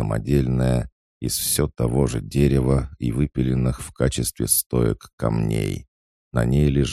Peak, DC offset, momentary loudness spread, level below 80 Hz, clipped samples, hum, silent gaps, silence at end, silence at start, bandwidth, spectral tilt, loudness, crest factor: -6 dBFS; under 0.1%; 7 LU; -32 dBFS; under 0.1%; none; 0.92-1.21 s, 4.66-4.70 s, 5.13-5.18 s, 5.88-6.31 s; 0 s; 0 s; 16 kHz; -5.5 dB/octave; -22 LUFS; 16 dB